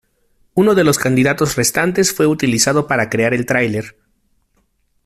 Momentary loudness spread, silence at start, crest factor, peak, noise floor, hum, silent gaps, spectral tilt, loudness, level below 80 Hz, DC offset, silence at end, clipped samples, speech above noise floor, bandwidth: 5 LU; 0.55 s; 16 dB; 0 dBFS; -62 dBFS; none; none; -4 dB/octave; -15 LUFS; -48 dBFS; under 0.1%; 1.15 s; under 0.1%; 47 dB; 16 kHz